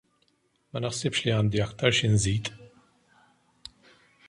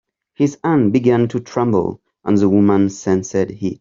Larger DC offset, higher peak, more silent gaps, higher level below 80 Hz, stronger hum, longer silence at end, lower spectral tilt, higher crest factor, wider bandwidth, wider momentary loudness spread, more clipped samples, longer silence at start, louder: neither; second, -6 dBFS vs -2 dBFS; neither; about the same, -50 dBFS vs -54 dBFS; neither; first, 1.6 s vs 0.05 s; second, -4.5 dB/octave vs -7.5 dB/octave; first, 22 dB vs 14 dB; first, 11.5 kHz vs 7.6 kHz; first, 24 LU vs 7 LU; neither; first, 0.75 s vs 0.4 s; second, -26 LUFS vs -17 LUFS